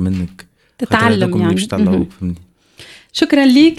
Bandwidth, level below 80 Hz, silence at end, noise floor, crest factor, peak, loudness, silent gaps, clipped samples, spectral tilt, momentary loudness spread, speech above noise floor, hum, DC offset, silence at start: 13.5 kHz; -44 dBFS; 0.05 s; -41 dBFS; 14 dB; 0 dBFS; -14 LUFS; none; under 0.1%; -6 dB/octave; 15 LU; 28 dB; none; under 0.1%; 0 s